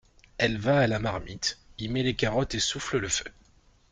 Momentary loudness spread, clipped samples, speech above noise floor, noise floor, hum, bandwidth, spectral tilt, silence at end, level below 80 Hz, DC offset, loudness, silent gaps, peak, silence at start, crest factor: 9 LU; under 0.1%; 33 dB; -60 dBFS; none; 9.8 kHz; -4 dB/octave; 0.6 s; -48 dBFS; under 0.1%; -28 LUFS; none; -8 dBFS; 0.4 s; 20 dB